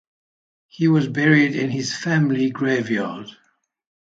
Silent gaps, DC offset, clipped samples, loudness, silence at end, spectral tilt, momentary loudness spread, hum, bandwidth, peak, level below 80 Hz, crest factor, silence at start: none; under 0.1%; under 0.1%; -20 LUFS; 0.75 s; -6 dB/octave; 10 LU; none; 7.8 kHz; -2 dBFS; -64 dBFS; 20 dB; 0.8 s